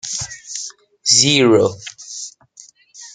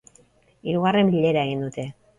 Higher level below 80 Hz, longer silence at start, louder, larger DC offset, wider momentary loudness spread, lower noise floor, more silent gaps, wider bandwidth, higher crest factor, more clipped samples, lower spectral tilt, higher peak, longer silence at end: about the same, -56 dBFS vs -58 dBFS; second, 0.05 s vs 0.65 s; first, -14 LUFS vs -22 LUFS; neither; first, 20 LU vs 14 LU; second, -46 dBFS vs -58 dBFS; neither; about the same, 11 kHz vs 10 kHz; about the same, 18 dB vs 16 dB; neither; second, -2.5 dB/octave vs -7 dB/octave; first, 0 dBFS vs -8 dBFS; second, 0.05 s vs 0.25 s